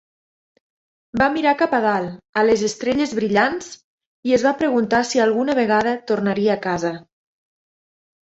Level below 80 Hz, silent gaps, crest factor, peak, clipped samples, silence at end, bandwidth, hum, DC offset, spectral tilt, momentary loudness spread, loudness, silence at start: -56 dBFS; 2.29-2.33 s, 3.84-3.98 s, 4.06-4.23 s; 18 dB; -2 dBFS; under 0.1%; 1.25 s; 8.2 kHz; none; under 0.1%; -5 dB/octave; 8 LU; -19 LUFS; 1.15 s